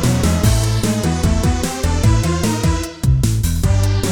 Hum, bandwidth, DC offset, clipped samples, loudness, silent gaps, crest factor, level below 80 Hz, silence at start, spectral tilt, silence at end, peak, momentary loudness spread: none; 18 kHz; under 0.1%; under 0.1%; -17 LUFS; none; 14 dB; -22 dBFS; 0 s; -5.5 dB/octave; 0 s; -2 dBFS; 3 LU